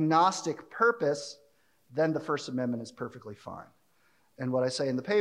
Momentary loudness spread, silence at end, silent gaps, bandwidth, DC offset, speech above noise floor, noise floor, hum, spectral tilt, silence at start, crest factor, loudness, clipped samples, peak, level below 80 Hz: 18 LU; 0 s; none; 12 kHz; under 0.1%; 40 dB; -69 dBFS; none; -5 dB/octave; 0 s; 20 dB; -30 LUFS; under 0.1%; -12 dBFS; -76 dBFS